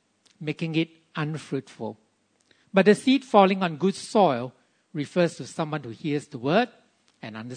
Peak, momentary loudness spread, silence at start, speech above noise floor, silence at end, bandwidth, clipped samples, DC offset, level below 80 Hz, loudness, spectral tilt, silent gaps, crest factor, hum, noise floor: -4 dBFS; 18 LU; 0.4 s; 41 dB; 0 s; 9.6 kHz; under 0.1%; under 0.1%; -76 dBFS; -25 LUFS; -6 dB/octave; none; 22 dB; none; -65 dBFS